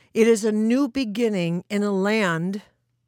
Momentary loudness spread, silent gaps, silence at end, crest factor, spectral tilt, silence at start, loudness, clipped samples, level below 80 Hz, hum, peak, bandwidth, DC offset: 7 LU; none; 0.45 s; 16 dB; -5.5 dB/octave; 0.15 s; -22 LUFS; under 0.1%; -64 dBFS; none; -6 dBFS; 16.5 kHz; under 0.1%